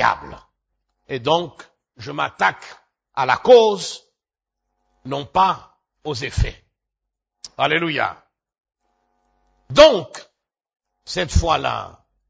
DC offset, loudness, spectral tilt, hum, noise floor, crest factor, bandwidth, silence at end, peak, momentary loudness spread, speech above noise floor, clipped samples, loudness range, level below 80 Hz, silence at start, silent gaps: under 0.1%; -18 LUFS; -4.5 dB/octave; none; -85 dBFS; 22 dB; 8 kHz; 0.45 s; 0 dBFS; 24 LU; 67 dB; under 0.1%; 6 LU; -36 dBFS; 0 s; none